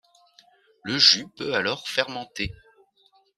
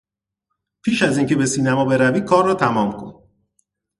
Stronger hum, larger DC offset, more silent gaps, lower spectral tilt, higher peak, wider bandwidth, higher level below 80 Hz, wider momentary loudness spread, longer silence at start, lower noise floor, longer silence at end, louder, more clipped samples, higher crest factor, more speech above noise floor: neither; neither; neither; second, -2 dB/octave vs -5.5 dB/octave; about the same, -2 dBFS vs -2 dBFS; first, 13.5 kHz vs 11.5 kHz; about the same, -54 dBFS vs -56 dBFS; first, 16 LU vs 10 LU; about the same, 0.85 s vs 0.85 s; second, -63 dBFS vs -79 dBFS; about the same, 0.85 s vs 0.85 s; second, -22 LUFS vs -18 LUFS; neither; first, 26 dB vs 18 dB; second, 38 dB vs 62 dB